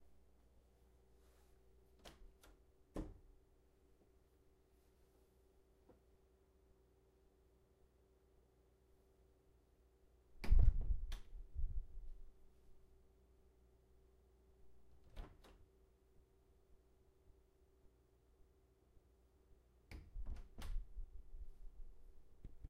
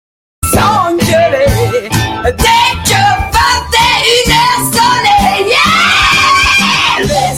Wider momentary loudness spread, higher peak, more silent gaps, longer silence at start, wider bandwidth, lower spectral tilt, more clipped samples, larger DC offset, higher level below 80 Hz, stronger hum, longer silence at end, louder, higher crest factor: first, 26 LU vs 6 LU; second, -18 dBFS vs 0 dBFS; neither; first, 2.05 s vs 0.4 s; second, 6.2 kHz vs 17.5 kHz; first, -7 dB/octave vs -3 dB/octave; neither; neither; second, -48 dBFS vs -26 dBFS; neither; about the same, 0.05 s vs 0 s; second, -46 LUFS vs -8 LUFS; first, 28 dB vs 10 dB